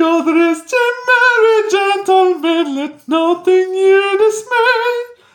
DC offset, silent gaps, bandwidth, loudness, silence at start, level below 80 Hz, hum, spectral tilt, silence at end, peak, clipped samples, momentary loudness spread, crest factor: under 0.1%; none; 17 kHz; -13 LUFS; 0 s; -70 dBFS; none; -2 dB/octave; 0.25 s; -2 dBFS; under 0.1%; 6 LU; 12 dB